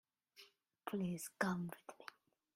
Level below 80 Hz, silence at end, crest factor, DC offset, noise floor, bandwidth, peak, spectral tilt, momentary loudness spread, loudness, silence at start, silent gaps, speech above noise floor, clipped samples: -80 dBFS; 0.5 s; 24 dB; under 0.1%; -67 dBFS; 16 kHz; -22 dBFS; -5.5 dB/octave; 22 LU; -44 LUFS; 0.35 s; none; 24 dB; under 0.1%